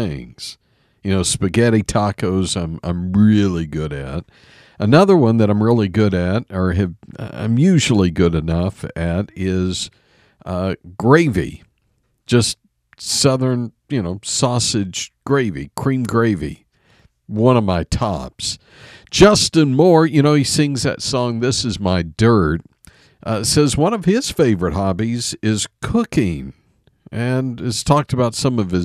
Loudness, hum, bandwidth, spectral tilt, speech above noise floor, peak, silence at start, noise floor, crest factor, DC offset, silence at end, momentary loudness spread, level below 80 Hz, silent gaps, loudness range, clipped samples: -17 LUFS; none; 15 kHz; -5.5 dB/octave; 48 dB; 0 dBFS; 0 s; -65 dBFS; 18 dB; under 0.1%; 0 s; 12 LU; -38 dBFS; none; 5 LU; under 0.1%